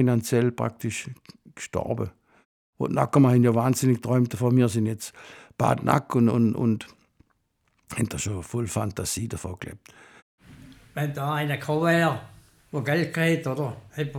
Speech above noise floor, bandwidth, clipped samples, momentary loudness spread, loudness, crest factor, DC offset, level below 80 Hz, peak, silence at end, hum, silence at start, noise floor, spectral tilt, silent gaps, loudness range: 46 dB; 17 kHz; under 0.1%; 14 LU; -25 LUFS; 22 dB; under 0.1%; -58 dBFS; -4 dBFS; 0 s; none; 0 s; -71 dBFS; -6 dB/octave; 2.45-2.73 s, 10.22-10.38 s; 9 LU